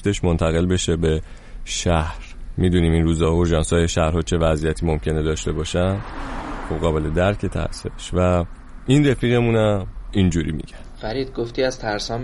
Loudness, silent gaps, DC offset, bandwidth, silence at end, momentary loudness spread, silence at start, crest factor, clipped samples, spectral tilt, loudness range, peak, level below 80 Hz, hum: -21 LUFS; none; under 0.1%; 11.5 kHz; 0 s; 13 LU; 0 s; 16 dB; under 0.1%; -6 dB/octave; 3 LU; -4 dBFS; -30 dBFS; none